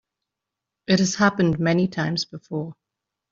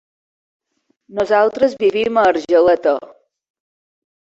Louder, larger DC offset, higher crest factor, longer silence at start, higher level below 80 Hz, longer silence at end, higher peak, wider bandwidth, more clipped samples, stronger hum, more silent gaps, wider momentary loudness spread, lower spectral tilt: second, -22 LUFS vs -15 LUFS; neither; about the same, 20 dB vs 16 dB; second, 0.9 s vs 1.1 s; about the same, -56 dBFS vs -58 dBFS; second, 0.6 s vs 1.3 s; about the same, -4 dBFS vs -2 dBFS; about the same, 7.6 kHz vs 7.8 kHz; neither; neither; neither; first, 12 LU vs 9 LU; about the same, -5 dB/octave vs -5 dB/octave